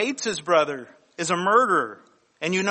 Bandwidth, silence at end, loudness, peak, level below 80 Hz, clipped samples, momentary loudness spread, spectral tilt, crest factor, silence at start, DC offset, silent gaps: 8.8 kHz; 0 s; -23 LUFS; -6 dBFS; -70 dBFS; under 0.1%; 14 LU; -3.5 dB/octave; 18 dB; 0 s; under 0.1%; none